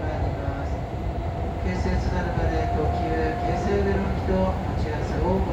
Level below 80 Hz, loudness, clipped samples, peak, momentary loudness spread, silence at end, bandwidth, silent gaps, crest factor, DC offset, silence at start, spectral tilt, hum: -30 dBFS; -26 LUFS; under 0.1%; -10 dBFS; 6 LU; 0 s; 8.4 kHz; none; 14 dB; under 0.1%; 0 s; -8 dB/octave; none